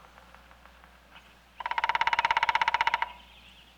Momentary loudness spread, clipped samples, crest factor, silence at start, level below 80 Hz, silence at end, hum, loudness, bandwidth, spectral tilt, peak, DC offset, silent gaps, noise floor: 12 LU; under 0.1%; 20 dB; 1.15 s; -60 dBFS; 0.55 s; none; -27 LUFS; 13 kHz; -1 dB/octave; -10 dBFS; under 0.1%; none; -55 dBFS